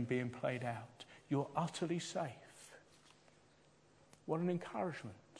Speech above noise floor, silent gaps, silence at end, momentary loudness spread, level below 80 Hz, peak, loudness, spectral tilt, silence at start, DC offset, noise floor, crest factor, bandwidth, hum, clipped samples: 28 dB; none; 0 s; 19 LU; -80 dBFS; -24 dBFS; -41 LUFS; -6 dB/octave; 0 s; under 0.1%; -69 dBFS; 20 dB; 11 kHz; none; under 0.1%